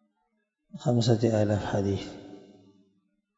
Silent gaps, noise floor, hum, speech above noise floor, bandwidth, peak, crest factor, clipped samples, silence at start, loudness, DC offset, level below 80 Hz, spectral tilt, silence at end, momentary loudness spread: none; -77 dBFS; none; 51 dB; 8 kHz; -8 dBFS; 20 dB; under 0.1%; 0.75 s; -27 LUFS; under 0.1%; -60 dBFS; -7 dB/octave; 1 s; 22 LU